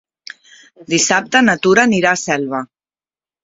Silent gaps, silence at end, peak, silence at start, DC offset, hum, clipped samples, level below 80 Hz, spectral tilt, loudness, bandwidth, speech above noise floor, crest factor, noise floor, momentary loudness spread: none; 0.8 s; 0 dBFS; 0.8 s; under 0.1%; none; under 0.1%; -56 dBFS; -3 dB/octave; -14 LUFS; 8 kHz; over 76 dB; 16 dB; under -90 dBFS; 13 LU